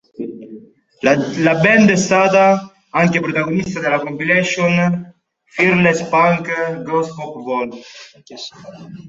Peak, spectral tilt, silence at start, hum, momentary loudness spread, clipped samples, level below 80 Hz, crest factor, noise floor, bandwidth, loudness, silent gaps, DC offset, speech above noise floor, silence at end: 0 dBFS; -5.5 dB/octave; 0.2 s; none; 18 LU; under 0.1%; -54 dBFS; 16 dB; -40 dBFS; 8 kHz; -15 LUFS; none; under 0.1%; 24 dB; 0 s